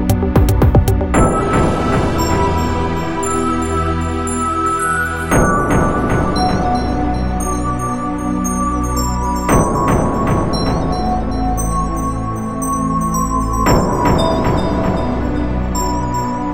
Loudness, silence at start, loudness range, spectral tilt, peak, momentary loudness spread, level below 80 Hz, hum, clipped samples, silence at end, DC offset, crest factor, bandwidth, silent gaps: -16 LUFS; 0 s; 2 LU; -6 dB/octave; 0 dBFS; 5 LU; -22 dBFS; none; under 0.1%; 0 s; 2%; 14 dB; 16.5 kHz; none